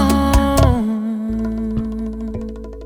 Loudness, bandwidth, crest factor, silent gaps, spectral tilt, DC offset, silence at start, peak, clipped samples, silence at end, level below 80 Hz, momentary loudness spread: -19 LUFS; over 20 kHz; 16 dB; none; -6.5 dB/octave; under 0.1%; 0 s; -2 dBFS; under 0.1%; 0 s; -24 dBFS; 12 LU